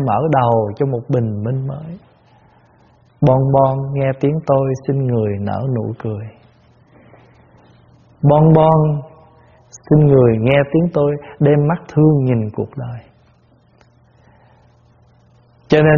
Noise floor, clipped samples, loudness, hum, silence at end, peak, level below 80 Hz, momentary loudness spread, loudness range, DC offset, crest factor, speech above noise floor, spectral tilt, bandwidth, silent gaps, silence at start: -52 dBFS; under 0.1%; -15 LUFS; none; 0 s; 0 dBFS; -46 dBFS; 14 LU; 9 LU; under 0.1%; 16 dB; 38 dB; -8 dB/octave; 7 kHz; none; 0 s